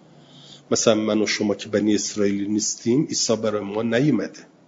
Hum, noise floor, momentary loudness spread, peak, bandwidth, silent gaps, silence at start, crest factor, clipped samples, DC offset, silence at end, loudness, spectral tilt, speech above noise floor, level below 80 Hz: none; -48 dBFS; 6 LU; -2 dBFS; 7.8 kHz; none; 0.35 s; 20 dB; under 0.1%; under 0.1%; 0.25 s; -22 LUFS; -4 dB/octave; 26 dB; -64 dBFS